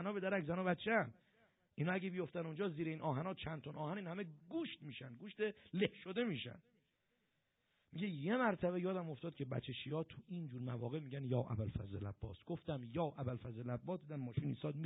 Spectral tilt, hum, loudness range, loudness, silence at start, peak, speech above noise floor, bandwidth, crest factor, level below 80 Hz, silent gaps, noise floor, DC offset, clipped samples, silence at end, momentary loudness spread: -4.5 dB/octave; none; 3 LU; -43 LUFS; 0 s; -22 dBFS; 41 dB; 3.9 kHz; 20 dB; -70 dBFS; none; -84 dBFS; under 0.1%; under 0.1%; 0 s; 10 LU